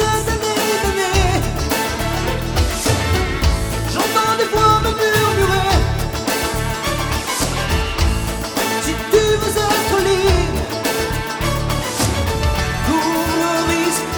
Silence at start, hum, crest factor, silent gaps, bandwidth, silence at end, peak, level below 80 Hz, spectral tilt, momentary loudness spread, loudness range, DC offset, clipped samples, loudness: 0 s; none; 16 dB; none; over 20 kHz; 0 s; -2 dBFS; -24 dBFS; -4 dB/octave; 5 LU; 2 LU; under 0.1%; under 0.1%; -17 LUFS